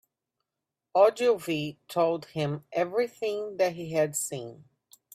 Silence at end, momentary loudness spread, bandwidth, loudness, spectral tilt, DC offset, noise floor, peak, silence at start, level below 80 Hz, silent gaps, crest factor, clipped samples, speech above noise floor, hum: 0.6 s; 10 LU; 16 kHz; -28 LUFS; -4.5 dB/octave; under 0.1%; -87 dBFS; -8 dBFS; 0.95 s; -74 dBFS; none; 20 dB; under 0.1%; 60 dB; none